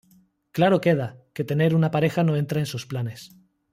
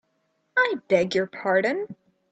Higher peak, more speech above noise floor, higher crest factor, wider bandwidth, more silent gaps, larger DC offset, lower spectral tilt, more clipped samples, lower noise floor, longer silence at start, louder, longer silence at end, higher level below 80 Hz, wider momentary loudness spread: about the same, -8 dBFS vs -6 dBFS; second, 37 dB vs 48 dB; about the same, 16 dB vs 18 dB; first, 15.5 kHz vs 8.4 kHz; neither; neither; first, -7 dB/octave vs -5 dB/octave; neither; second, -60 dBFS vs -72 dBFS; about the same, 0.55 s vs 0.55 s; about the same, -23 LUFS vs -24 LUFS; about the same, 0.45 s vs 0.4 s; first, -62 dBFS vs -68 dBFS; first, 13 LU vs 7 LU